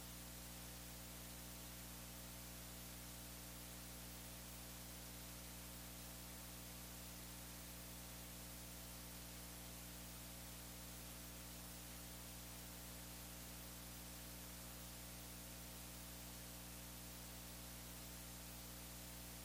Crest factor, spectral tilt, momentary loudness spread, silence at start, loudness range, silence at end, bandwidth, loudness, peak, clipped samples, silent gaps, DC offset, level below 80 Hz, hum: 12 dB; -3 dB/octave; 0 LU; 0 s; 0 LU; 0 s; 16.5 kHz; -53 LUFS; -42 dBFS; under 0.1%; none; under 0.1%; -62 dBFS; 60 Hz at -60 dBFS